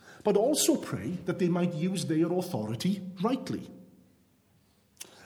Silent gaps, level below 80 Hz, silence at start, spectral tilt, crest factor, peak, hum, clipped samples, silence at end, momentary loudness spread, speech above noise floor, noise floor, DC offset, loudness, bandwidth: none; -70 dBFS; 0.05 s; -5 dB/octave; 18 dB; -12 dBFS; none; under 0.1%; 0 s; 13 LU; 37 dB; -66 dBFS; under 0.1%; -29 LUFS; 19.5 kHz